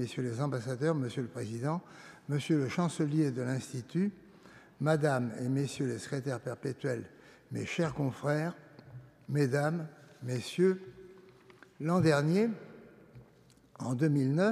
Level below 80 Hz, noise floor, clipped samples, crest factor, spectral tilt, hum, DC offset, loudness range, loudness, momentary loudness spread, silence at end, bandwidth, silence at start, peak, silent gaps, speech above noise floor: -70 dBFS; -62 dBFS; under 0.1%; 20 dB; -7 dB/octave; none; under 0.1%; 3 LU; -33 LUFS; 16 LU; 0 s; 14 kHz; 0 s; -14 dBFS; none; 30 dB